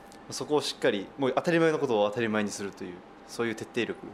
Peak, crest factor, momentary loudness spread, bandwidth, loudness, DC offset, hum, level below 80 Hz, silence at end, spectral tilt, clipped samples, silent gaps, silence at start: -10 dBFS; 18 dB; 15 LU; 14.5 kHz; -29 LUFS; under 0.1%; none; -68 dBFS; 0 s; -4.5 dB/octave; under 0.1%; none; 0 s